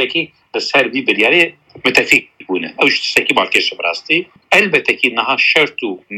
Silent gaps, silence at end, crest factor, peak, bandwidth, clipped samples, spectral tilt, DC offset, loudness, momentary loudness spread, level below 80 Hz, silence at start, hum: none; 0 s; 16 dB; 0 dBFS; 17 kHz; under 0.1%; -2.5 dB/octave; under 0.1%; -13 LUFS; 9 LU; -56 dBFS; 0 s; none